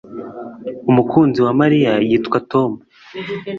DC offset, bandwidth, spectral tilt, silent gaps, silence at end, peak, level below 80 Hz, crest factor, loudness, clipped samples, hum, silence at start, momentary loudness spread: under 0.1%; 7 kHz; -8.5 dB/octave; none; 0 s; -2 dBFS; -54 dBFS; 16 dB; -16 LUFS; under 0.1%; none; 0.05 s; 18 LU